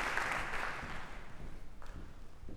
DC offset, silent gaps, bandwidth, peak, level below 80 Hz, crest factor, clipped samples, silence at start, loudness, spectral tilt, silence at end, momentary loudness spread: under 0.1%; none; 14.5 kHz; -20 dBFS; -48 dBFS; 20 dB; under 0.1%; 0 s; -40 LUFS; -3.5 dB/octave; 0 s; 19 LU